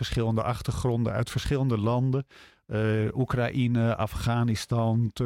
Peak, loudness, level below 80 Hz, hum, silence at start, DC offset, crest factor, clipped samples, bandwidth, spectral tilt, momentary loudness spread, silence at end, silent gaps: -14 dBFS; -27 LUFS; -44 dBFS; none; 0 s; under 0.1%; 12 dB; under 0.1%; 14.5 kHz; -7 dB/octave; 4 LU; 0 s; none